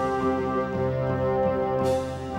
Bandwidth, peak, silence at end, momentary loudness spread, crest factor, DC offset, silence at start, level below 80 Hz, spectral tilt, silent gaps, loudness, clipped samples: 15.5 kHz; -12 dBFS; 0 s; 2 LU; 12 dB; under 0.1%; 0 s; -46 dBFS; -7.5 dB/octave; none; -26 LUFS; under 0.1%